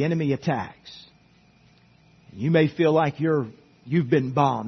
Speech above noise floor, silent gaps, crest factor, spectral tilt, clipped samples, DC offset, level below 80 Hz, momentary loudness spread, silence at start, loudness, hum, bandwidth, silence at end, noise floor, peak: 35 dB; none; 18 dB; -8 dB/octave; under 0.1%; under 0.1%; -62 dBFS; 16 LU; 0 s; -23 LUFS; none; 6.4 kHz; 0 s; -57 dBFS; -6 dBFS